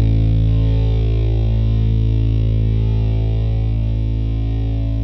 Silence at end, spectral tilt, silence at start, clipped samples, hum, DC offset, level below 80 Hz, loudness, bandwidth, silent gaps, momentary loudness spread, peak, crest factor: 0 s; -10 dB/octave; 0 s; under 0.1%; none; under 0.1%; -18 dBFS; -18 LUFS; 5 kHz; none; 4 LU; -6 dBFS; 8 dB